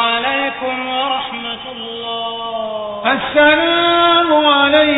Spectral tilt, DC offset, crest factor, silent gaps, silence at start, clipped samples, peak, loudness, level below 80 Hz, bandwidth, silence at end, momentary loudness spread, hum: -7 dB/octave; under 0.1%; 16 dB; none; 0 s; under 0.1%; 0 dBFS; -14 LUFS; -50 dBFS; 4 kHz; 0 s; 13 LU; none